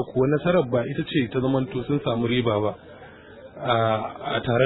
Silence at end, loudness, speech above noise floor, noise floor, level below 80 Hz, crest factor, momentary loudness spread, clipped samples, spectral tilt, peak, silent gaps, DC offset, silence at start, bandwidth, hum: 0 s; -24 LUFS; 22 dB; -45 dBFS; -52 dBFS; 16 dB; 8 LU; under 0.1%; -11 dB/octave; -8 dBFS; none; under 0.1%; 0 s; 4.1 kHz; none